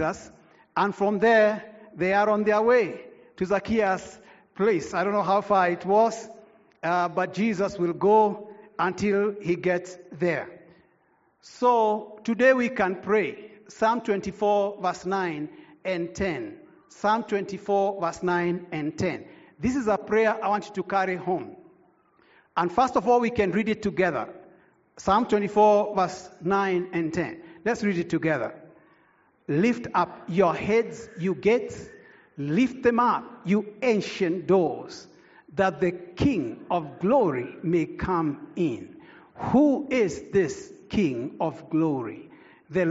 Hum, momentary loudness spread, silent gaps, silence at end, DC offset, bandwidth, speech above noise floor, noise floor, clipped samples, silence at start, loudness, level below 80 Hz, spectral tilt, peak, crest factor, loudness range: none; 12 LU; none; 0 s; under 0.1%; 8 kHz; 41 dB; -65 dBFS; under 0.1%; 0 s; -25 LUFS; -56 dBFS; -5 dB/octave; -8 dBFS; 18 dB; 4 LU